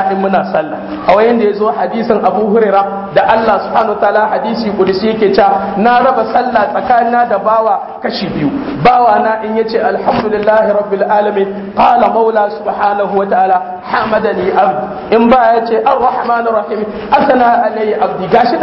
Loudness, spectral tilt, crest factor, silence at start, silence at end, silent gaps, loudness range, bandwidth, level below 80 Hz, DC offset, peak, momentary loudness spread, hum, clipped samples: -11 LUFS; -8.5 dB/octave; 10 dB; 0 s; 0 s; none; 1 LU; 5.8 kHz; -44 dBFS; under 0.1%; 0 dBFS; 7 LU; none; under 0.1%